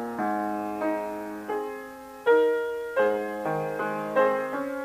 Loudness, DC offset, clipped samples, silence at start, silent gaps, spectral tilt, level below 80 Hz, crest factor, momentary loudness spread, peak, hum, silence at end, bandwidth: -27 LUFS; under 0.1%; under 0.1%; 0 s; none; -6 dB/octave; -66 dBFS; 16 dB; 11 LU; -10 dBFS; none; 0 s; 15.5 kHz